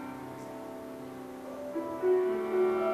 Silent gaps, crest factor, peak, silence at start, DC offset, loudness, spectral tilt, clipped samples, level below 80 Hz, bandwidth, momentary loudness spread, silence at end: none; 14 dB; -18 dBFS; 0 s; under 0.1%; -33 LUFS; -6.5 dB/octave; under 0.1%; -70 dBFS; 14 kHz; 15 LU; 0 s